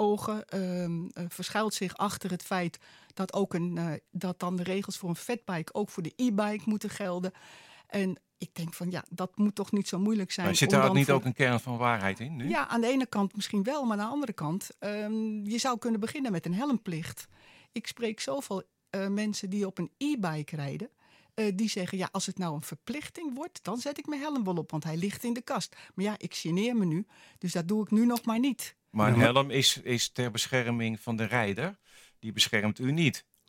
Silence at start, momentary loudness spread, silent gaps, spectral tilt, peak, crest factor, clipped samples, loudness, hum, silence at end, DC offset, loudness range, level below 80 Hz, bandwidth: 0 s; 12 LU; none; -5 dB/octave; -6 dBFS; 24 dB; under 0.1%; -31 LUFS; none; 0.25 s; under 0.1%; 7 LU; -72 dBFS; 16.5 kHz